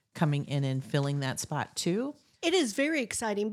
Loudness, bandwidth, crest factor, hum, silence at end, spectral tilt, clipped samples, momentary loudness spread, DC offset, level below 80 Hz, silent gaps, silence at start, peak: -30 LUFS; 15 kHz; 18 dB; none; 0 s; -5 dB/octave; under 0.1%; 6 LU; under 0.1%; -70 dBFS; none; 0.15 s; -12 dBFS